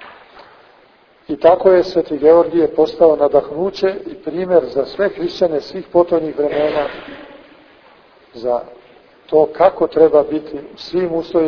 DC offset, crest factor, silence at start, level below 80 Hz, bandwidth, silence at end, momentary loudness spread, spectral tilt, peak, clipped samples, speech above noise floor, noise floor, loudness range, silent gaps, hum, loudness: under 0.1%; 16 dB; 0 s; -50 dBFS; 5.4 kHz; 0 s; 13 LU; -7 dB/octave; 0 dBFS; under 0.1%; 35 dB; -50 dBFS; 6 LU; none; none; -15 LUFS